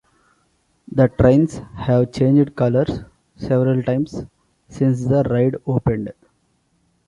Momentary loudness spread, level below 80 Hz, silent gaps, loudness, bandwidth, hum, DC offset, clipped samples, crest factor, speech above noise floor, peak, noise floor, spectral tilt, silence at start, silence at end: 13 LU; -42 dBFS; none; -18 LUFS; 10.5 kHz; none; under 0.1%; under 0.1%; 18 dB; 47 dB; -2 dBFS; -64 dBFS; -9 dB/octave; 0.9 s; 0.95 s